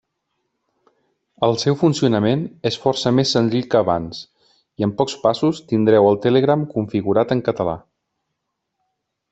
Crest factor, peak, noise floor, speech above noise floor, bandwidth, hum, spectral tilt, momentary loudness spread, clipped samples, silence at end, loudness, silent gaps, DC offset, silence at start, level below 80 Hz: 18 dB; -2 dBFS; -77 dBFS; 59 dB; 8.2 kHz; none; -6 dB/octave; 9 LU; under 0.1%; 1.55 s; -18 LUFS; none; under 0.1%; 1.4 s; -56 dBFS